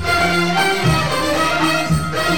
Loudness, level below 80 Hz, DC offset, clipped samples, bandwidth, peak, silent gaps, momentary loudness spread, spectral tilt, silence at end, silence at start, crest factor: -16 LUFS; -36 dBFS; 2%; under 0.1%; 19 kHz; -4 dBFS; none; 2 LU; -4.5 dB/octave; 0 s; 0 s; 12 dB